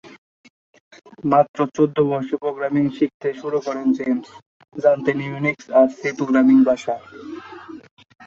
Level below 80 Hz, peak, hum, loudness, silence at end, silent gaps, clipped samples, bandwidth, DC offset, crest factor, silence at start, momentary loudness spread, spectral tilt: -64 dBFS; -2 dBFS; none; -20 LUFS; 0 s; 0.18-0.44 s, 0.50-0.73 s, 0.80-0.91 s, 1.49-1.54 s, 3.14-3.20 s, 4.46-4.60 s, 7.91-7.97 s; under 0.1%; 7.4 kHz; under 0.1%; 18 dB; 0.05 s; 20 LU; -7.5 dB/octave